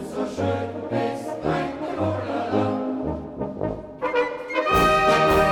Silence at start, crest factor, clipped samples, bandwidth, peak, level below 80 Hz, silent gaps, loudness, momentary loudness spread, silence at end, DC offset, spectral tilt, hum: 0 s; 16 dB; under 0.1%; 18 kHz; -8 dBFS; -42 dBFS; none; -23 LUFS; 12 LU; 0 s; under 0.1%; -6 dB/octave; none